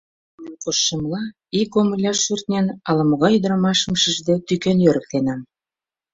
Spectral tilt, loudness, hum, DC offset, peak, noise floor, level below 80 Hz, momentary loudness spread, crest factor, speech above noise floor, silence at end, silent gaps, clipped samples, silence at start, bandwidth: -4.5 dB/octave; -19 LUFS; none; under 0.1%; -2 dBFS; under -90 dBFS; -54 dBFS; 8 LU; 18 dB; over 71 dB; 0.7 s; none; under 0.1%; 0.4 s; 7.8 kHz